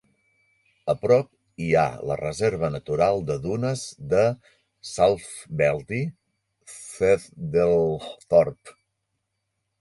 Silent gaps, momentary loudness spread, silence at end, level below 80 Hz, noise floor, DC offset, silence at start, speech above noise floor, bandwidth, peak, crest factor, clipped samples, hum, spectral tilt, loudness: none; 13 LU; 1.1 s; -52 dBFS; -78 dBFS; under 0.1%; 0.85 s; 55 dB; 11.5 kHz; -4 dBFS; 20 dB; under 0.1%; none; -6 dB/octave; -24 LUFS